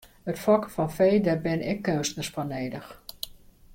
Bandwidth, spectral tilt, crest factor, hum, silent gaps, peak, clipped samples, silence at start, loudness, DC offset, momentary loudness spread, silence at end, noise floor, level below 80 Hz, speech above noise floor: 16.5 kHz; -5.5 dB/octave; 18 dB; none; none; -8 dBFS; under 0.1%; 0.25 s; -26 LUFS; under 0.1%; 16 LU; 0.4 s; -50 dBFS; -54 dBFS; 24 dB